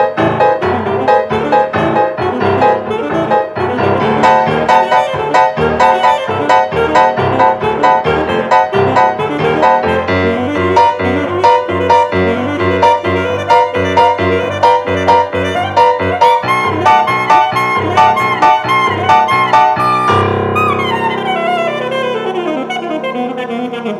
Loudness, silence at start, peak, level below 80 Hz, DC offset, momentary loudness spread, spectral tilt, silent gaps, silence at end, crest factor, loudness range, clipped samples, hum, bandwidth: -12 LUFS; 0 s; 0 dBFS; -44 dBFS; under 0.1%; 6 LU; -6 dB/octave; none; 0 s; 12 dB; 3 LU; under 0.1%; none; 12.5 kHz